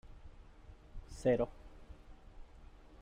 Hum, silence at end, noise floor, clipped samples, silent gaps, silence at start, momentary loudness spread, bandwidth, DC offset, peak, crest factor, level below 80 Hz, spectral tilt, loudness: none; 0 s; -57 dBFS; under 0.1%; none; 0.05 s; 27 LU; 11 kHz; under 0.1%; -20 dBFS; 22 dB; -54 dBFS; -7 dB/octave; -36 LUFS